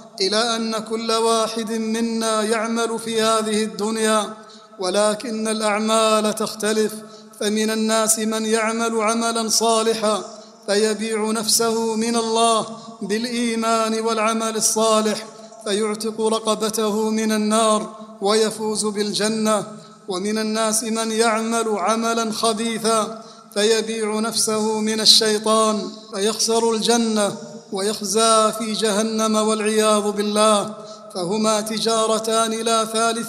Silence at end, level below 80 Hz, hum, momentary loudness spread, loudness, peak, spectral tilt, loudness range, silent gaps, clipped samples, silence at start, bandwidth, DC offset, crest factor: 0 s; -68 dBFS; none; 8 LU; -19 LUFS; 0 dBFS; -2.5 dB/octave; 3 LU; none; under 0.1%; 0 s; 15.5 kHz; under 0.1%; 20 dB